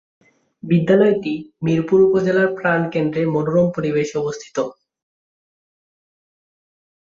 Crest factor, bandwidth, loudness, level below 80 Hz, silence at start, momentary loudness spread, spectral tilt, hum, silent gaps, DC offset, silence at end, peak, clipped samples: 16 dB; 7.6 kHz; -18 LUFS; -58 dBFS; 0.65 s; 11 LU; -7.5 dB/octave; none; none; under 0.1%; 2.4 s; -4 dBFS; under 0.1%